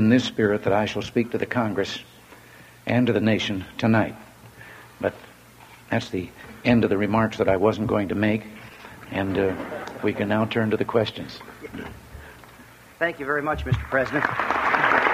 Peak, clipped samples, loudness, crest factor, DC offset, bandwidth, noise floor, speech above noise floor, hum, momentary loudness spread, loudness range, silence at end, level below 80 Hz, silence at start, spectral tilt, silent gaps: -4 dBFS; under 0.1%; -24 LUFS; 20 dB; under 0.1%; 15.5 kHz; -48 dBFS; 25 dB; none; 19 LU; 4 LU; 0 s; -48 dBFS; 0 s; -6.5 dB/octave; none